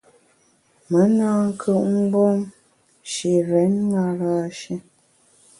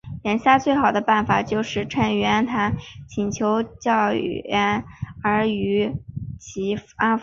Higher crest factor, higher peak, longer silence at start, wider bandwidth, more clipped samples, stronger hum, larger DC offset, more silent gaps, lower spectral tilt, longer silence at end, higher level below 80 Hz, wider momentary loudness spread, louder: second, 14 dB vs 20 dB; second, -6 dBFS vs -2 dBFS; first, 0.9 s vs 0.05 s; first, 11.5 kHz vs 7.4 kHz; neither; neither; neither; neither; first, -7 dB/octave vs -5.5 dB/octave; first, 0.8 s vs 0 s; second, -64 dBFS vs -48 dBFS; first, 14 LU vs 11 LU; about the same, -20 LUFS vs -22 LUFS